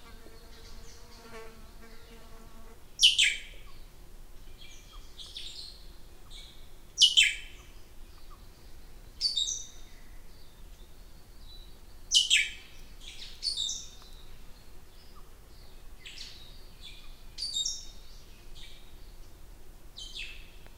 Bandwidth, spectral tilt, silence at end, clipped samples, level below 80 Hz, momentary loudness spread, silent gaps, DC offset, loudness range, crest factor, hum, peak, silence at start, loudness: 16 kHz; 1.5 dB/octave; 0 s; under 0.1%; -50 dBFS; 29 LU; none; under 0.1%; 16 LU; 28 dB; none; -8 dBFS; 0 s; -26 LUFS